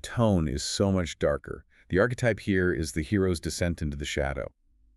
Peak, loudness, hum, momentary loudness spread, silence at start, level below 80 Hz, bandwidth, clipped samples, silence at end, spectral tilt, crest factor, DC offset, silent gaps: -10 dBFS; -28 LUFS; none; 8 LU; 0.05 s; -42 dBFS; 13.5 kHz; under 0.1%; 0.5 s; -5.5 dB/octave; 18 dB; under 0.1%; none